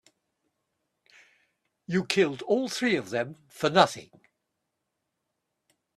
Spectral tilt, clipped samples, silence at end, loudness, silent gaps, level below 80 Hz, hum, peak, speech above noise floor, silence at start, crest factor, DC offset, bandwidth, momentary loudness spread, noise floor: -4.5 dB/octave; under 0.1%; 1.95 s; -26 LUFS; none; -72 dBFS; none; -4 dBFS; 56 dB; 1.9 s; 26 dB; under 0.1%; 13.5 kHz; 10 LU; -82 dBFS